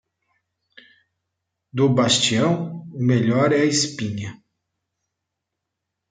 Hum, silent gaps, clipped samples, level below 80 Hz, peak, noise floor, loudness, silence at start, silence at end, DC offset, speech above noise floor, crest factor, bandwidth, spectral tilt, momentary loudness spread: none; none; under 0.1%; -64 dBFS; -6 dBFS; -81 dBFS; -19 LUFS; 1.75 s; 1.75 s; under 0.1%; 62 dB; 18 dB; 9.6 kHz; -4.5 dB/octave; 15 LU